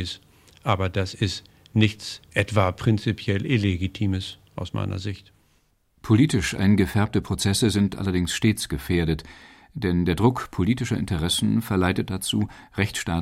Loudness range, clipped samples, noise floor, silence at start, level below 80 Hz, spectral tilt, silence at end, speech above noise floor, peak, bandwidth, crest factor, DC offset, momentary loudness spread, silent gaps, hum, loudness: 3 LU; under 0.1%; -64 dBFS; 0 s; -44 dBFS; -5.5 dB/octave; 0 s; 41 dB; -4 dBFS; 15.5 kHz; 20 dB; under 0.1%; 11 LU; none; none; -24 LUFS